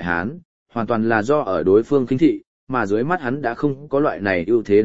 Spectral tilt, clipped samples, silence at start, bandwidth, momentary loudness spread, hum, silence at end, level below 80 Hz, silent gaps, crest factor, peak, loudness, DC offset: -8 dB/octave; under 0.1%; 0 s; 7.8 kHz; 8 LU; none; 0 s; -52 dBFS; 0.45-0.66 s, 2.47-2.67 s; 16 dB; -2 dBFS; -20 LUFS; 0.8%